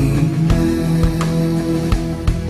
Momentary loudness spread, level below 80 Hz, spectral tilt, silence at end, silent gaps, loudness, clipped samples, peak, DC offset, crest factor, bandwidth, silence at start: 4 LU; -24 dBFS; -7.5 dB/octave; 0 s; none; -17 LUFS; under 0.1%; -4 dBFS; under 0.1%; 12 dB; 13.5 kHz; 0 s